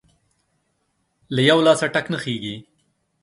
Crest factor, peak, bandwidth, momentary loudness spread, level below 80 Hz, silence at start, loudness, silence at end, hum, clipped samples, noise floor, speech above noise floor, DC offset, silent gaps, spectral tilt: 22 dB; 0 dBFS; 11.5 kHz; 15 LU; -62 dBFS; 1.3 s; -19 LUFS; 0.6 s; none; under 0.1%; -70 dBFS; 51 dB; under 0.1%; none; -5 dB/octave